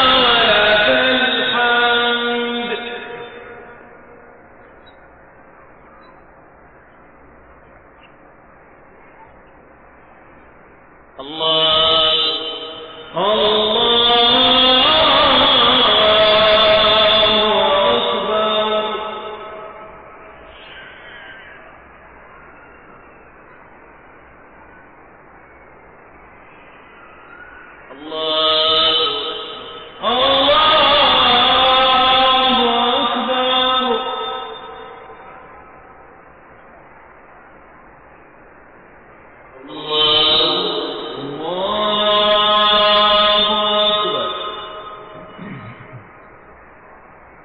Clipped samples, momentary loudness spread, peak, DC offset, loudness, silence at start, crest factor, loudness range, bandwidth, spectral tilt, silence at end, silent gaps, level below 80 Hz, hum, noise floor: under 0.1%; 23 LU; -2 dBFS; under 0.1%; -13 LUFS; 0 s; 16 dB; 15 LU; 5.2 kHz; -6 dB/octave; 1.4 s; none; -46 dBFS; none; -45 dBFS